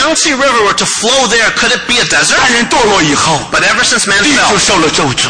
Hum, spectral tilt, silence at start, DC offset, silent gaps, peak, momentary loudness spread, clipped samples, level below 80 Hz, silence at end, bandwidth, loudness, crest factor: none; -2 dB/octave; 0 s; under 0.1%; none; 0 dBFS; 3 LU; under 0.1%; -36 dBFS; 0 s; 10.5 kHz; -8 LUFS; 10 dB